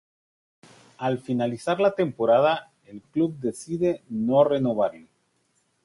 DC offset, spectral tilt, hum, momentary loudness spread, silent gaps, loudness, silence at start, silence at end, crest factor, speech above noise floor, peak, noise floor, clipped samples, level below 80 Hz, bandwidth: under 0.1%; -6.5 dB/octave; none; 10 LU; none; -24 LUFS; 1 s; 0.85 s; 20 dB; 46 dB; -6 dBFS; -70 dBFS; under 0.1%; -64 dBFS; 11.5 kHz